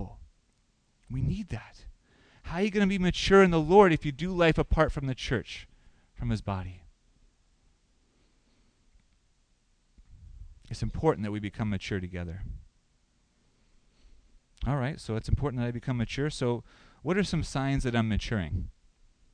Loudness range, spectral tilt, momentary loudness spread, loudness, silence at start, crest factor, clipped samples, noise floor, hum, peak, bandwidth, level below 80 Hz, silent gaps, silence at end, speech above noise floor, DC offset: 15 LU; -6.5 dB/octave; 19 LU; -28 LUFS; 0 s; 24 dB; under 0.1%; -69 dBFS; none; -6 dBFS; 10 kHz; -42 dBFS; none; 0.65 s; 42 dB; under 0.1%